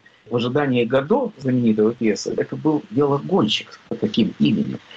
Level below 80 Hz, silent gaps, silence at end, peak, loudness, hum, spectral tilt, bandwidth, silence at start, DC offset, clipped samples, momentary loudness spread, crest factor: -58 dBFS; none; 0 s; -8 dBFS; -20 LUFS; none; -6 dB/octave; 7.8 kHz; 0.25 s; under 0.1%; under 0.1%; 5 LU; 12 dB